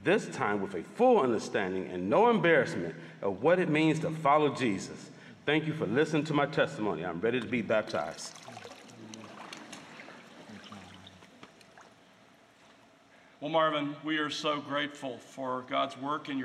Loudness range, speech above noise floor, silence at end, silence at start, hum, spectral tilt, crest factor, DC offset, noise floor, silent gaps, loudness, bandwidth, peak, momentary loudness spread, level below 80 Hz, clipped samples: 20 LU; 30 dB; 0 s; 0 s; none; -5.5 dB/octave; 20 dB; under 0.1%; -60 dBFS; none; -30 LUFS; 12 kHz; -12 dBFS; 22 LU; -76 dBFS; under 0.1%